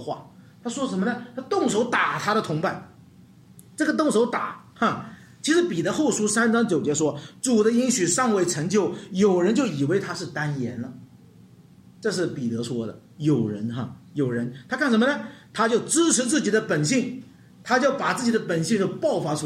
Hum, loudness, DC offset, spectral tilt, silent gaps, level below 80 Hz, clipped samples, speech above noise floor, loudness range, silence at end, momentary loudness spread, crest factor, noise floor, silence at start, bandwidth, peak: none; -23 LUFS; under 0.1%; -4.5 dB/octave; none; -68 dBFS; under 0.1%; 27 dB; 6 LU; 0 s; 13 LU; 18 dB; -51 dBFS; 0 s; 15 kHz; -6 dBFS